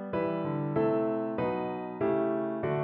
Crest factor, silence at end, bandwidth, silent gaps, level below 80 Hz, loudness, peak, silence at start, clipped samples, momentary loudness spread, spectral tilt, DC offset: 14 dB; 0 s; 4.3 kHz; none; -64 dBFS; -31 LUFS; -16 dBFS; 0 s; under 0.1%; 4 LU; -7.5 dB/octave; under 0.1%